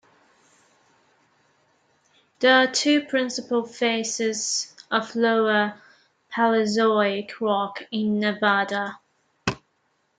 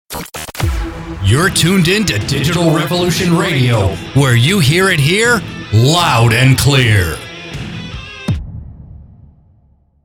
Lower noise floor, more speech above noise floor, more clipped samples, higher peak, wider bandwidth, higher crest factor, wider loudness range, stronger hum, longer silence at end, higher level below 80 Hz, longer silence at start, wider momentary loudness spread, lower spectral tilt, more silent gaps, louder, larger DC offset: first, -70 dBFS vs -51 dBFS; first, 47 dB vs 40 dB; neither; second, -4 dBFS vs 0 dBFS; second, 9.6 kHz vs 17.5 kHz; first, 20 dB vs 14 dB; about the same, 2 LU vs 4 LU; neither; second, 0.6 s vs 1 s; second, -66 dBFS vs -32 dBFS; first, 2.4 s vs 0.1 s; second, 10 LU vs 15 LU; second, -3 dB/octave vs -5 dB/octave; neither; second, -23 LUFS vs -12 LUFS; neither